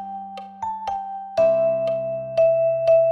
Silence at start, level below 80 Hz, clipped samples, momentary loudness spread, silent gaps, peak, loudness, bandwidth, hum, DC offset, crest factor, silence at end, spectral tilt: 0 s; -60 dBFS; under 0.1%; 14 LU; none; -10 dBFS; -21 LUFS; 6.6 kHz; none; under 0.1%; 12 dB; 0 s; -6.5 dB/octave